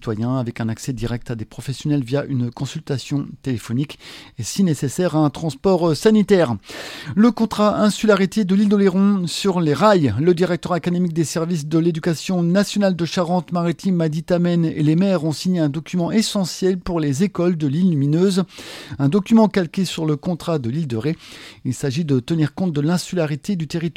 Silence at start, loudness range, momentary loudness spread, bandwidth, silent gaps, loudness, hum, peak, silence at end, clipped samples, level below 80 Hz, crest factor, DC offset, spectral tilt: 0 s; 6 LU; 10 LU; 15.5 kHz; none; -19 LUFS; none; -2 dBFS; 0.05 s; under 0.1%; -50 dBFS; 16 dB; under 0.1%; -6.5 dB/octave